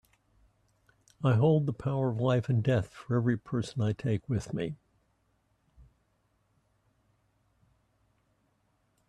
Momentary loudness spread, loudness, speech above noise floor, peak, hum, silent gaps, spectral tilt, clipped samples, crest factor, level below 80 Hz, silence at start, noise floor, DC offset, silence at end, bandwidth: 9 LU; -30 LUFS; 45 dB; -14 dBFS; none; none; -8 dB/octave; under 0.1%; 20 dB; -62 dBFS; 1.2 s; -73 dBFS; under 0.1%; 4.35 s; 10 kHz